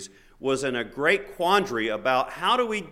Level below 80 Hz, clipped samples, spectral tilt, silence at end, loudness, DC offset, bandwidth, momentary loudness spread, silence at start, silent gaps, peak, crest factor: -56 dBFS; under 0.1%; -3.5 dB/octave; 0 s; -24 LUFS; under 0.1%; 16 kHz; 6 LU; 0 s; none; -6 dBFS; 18 dB